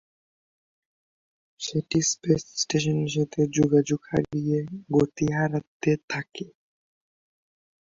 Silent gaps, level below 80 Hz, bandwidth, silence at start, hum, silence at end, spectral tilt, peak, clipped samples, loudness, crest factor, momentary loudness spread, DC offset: 5.67-5.80 s, 6.03-6.08 s; -58 dBFS; 7.8 kHz; 1.6 s; none; 1.4 s; -5 dB/octave; -8 dBFS; under 0.1%; -25 LUFS; 20 dB; 9 LU; under 0.1%